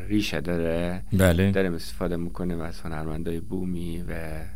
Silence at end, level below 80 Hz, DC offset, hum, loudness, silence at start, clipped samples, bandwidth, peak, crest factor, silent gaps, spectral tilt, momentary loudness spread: 0 s; -40 dBFS; 3%; none; -27 LUFS; 0 s; under 0.1%; 16 kHz; -6 dBFS; 22 dB; none; -6.5 dB/octave; 12 LU